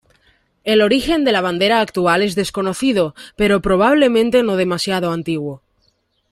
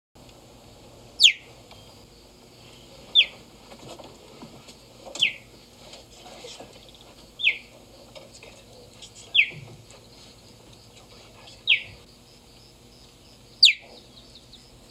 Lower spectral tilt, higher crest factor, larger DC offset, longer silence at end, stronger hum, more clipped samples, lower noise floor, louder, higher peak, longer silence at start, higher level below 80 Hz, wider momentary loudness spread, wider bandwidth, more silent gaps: first, -5 dB/octave vs 0.5 dB/octave; second, 16 dB vs 28 dB; neither; second, 0.75 s vs 1.15 s; neither; neither; first, -63 dBFS vs -51 dBFS; first, -16 LUFS vs -20 LUFS; about the same, -2 dBFS vs -2 dBFS; second, 0.65 s vs 1.2 s; first, -44 dBFS vs -60 dBFS; second, 8 LU vs 29 LU; about the same, 15.5 kHz vs 16 kHz; neither